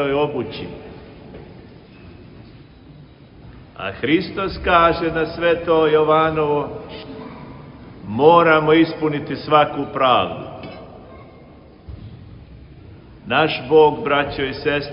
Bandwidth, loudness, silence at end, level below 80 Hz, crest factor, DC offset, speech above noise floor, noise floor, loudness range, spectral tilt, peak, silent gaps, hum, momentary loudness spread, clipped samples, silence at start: 5.6 kHz; -17 LUFS; 0 s; -44 dBFS; 20 dB; under 0.1%; 26 dB; -44 dBFS; 11 LU; -10 dB/octave; 0 dBFS; none; none; 25 LU; under 0.1%; 0 s